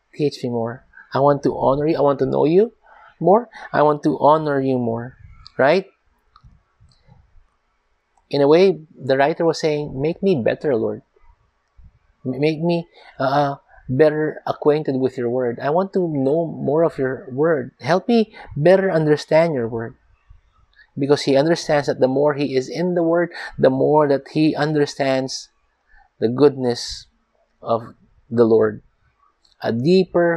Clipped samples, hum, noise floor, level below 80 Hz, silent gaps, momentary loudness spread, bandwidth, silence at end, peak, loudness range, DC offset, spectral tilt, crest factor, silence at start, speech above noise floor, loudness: under 0.1%; none; -66 dBFS; -54 dBFS; none; 11 LU; 10.5 kHz; 0 s; -2 dBFS; 5 LU; under 0.1%; -6.5 dB/octave; 18 dB; 0.2 s; 48 dB; -19 LUFS